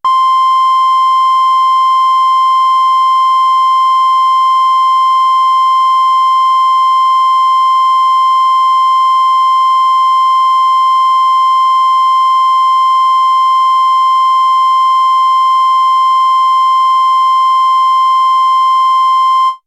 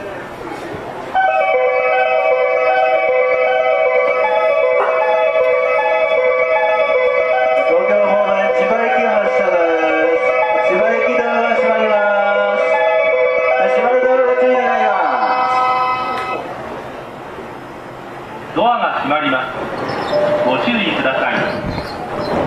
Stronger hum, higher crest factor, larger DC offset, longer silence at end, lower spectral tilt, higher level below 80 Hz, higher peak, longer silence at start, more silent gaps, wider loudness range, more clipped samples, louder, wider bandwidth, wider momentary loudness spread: neither; about the same, 6 dB vs 10 dB; neither; about the same, 0.1 s vs 0 s; second, 4 dB/octave vs -5.5 dB/octave; second, -74 dBFS vs -50 dBFS; about the same, -4 dBFS vs -4 dBFS; about the same, 0.05 s vs 0 s; neither; second, 0 LU vs 6 LU; neither; first, -8 LUFS vs -14 LUFS; first, 12 kHz vs 9.2 kHz; second, 0 LU vs 13 LU